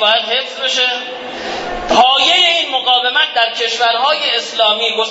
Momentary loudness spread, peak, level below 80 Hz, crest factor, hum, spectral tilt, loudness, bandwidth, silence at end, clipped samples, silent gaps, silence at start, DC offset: 13 LU; 0 dBFS; -46 dBFS; 14 dB; none; -0.5 dB/octave; -12 LUFS; 8 kHz; 0 s; under 0.1%; none; 0 s; under 0.1%